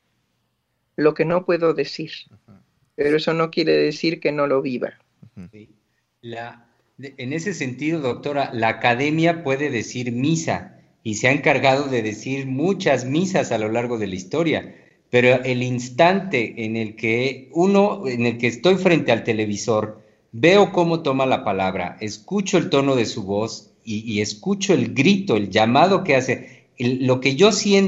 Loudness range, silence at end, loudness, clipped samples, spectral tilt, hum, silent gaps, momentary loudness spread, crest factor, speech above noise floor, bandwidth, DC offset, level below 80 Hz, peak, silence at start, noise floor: 5 LU; 0 s; -20 LUFS; under 0.1%; -5 dB/octave; none; none; 12 LU; 20 dB; 52 dB; 8.2 kHz; under 0.1%; -62 dBFS; 0 dBFS; 1 s; -71 dBFS